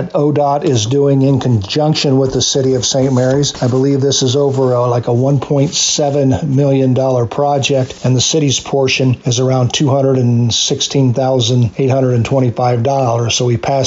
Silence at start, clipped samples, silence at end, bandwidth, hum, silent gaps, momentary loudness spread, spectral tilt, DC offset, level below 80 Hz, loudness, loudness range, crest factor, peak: 0 s; under 0.1%; 0 s; 7.8 kHz; none; none; 2 LU; -5 dB/octave; under 0.1%; -44 dBFS; -13 LUFS; 1 LU; 8 dB; -4 dBFS